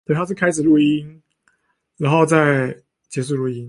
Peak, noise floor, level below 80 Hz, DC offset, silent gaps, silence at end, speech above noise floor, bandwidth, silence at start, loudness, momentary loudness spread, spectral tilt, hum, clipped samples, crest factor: -2 dBFS; -67 dBFS; -58 dBFS; under 0.1%; none; 0 s; 50 dB; 11.5 kHz; 0.1 s; -18 LUFS; 12 LU; -6.5 dB/octave; none; under 0.1%; 16 dB